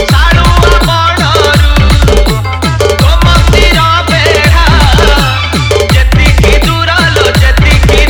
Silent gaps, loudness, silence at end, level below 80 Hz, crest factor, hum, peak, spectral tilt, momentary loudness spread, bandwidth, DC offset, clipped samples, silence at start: none; -6 LUFS; 0 s; -10 dBFS; 6 dB; none; 0 dBFS; -5 dB/octave; 3 LU; 19 kHz; under 0.1%; 4%; 0 s